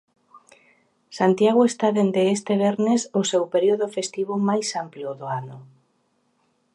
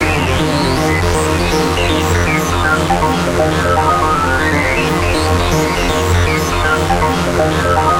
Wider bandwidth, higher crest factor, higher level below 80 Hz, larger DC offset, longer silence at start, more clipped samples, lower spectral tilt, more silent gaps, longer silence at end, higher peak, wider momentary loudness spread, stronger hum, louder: second, 11 kHz vs 17 kHz; first, 18 dB vs 12 dB; second, -74 dBFS vs -24 dBFS; neither; first, 0.35 s vs 0 s; neither; about the same, -5 dB/octave vs -5 dB/octave; neither; first, 1.1 s vs 0 s; second, -6 dBFS vs 0 dBFS; first, 13 LU vs 1 LU; neither; second, -22 LUFS vs -13 LUFS